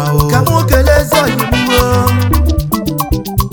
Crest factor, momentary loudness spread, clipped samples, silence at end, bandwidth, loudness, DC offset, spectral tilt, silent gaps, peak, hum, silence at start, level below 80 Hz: 10 dB; 6 LU; 0.2%; 0 s; over 20 kHz; -12 LUFS; under 0.1%; -5.5 dB/octave; none; 0 dBFS; none; 0 s; -18 dBFS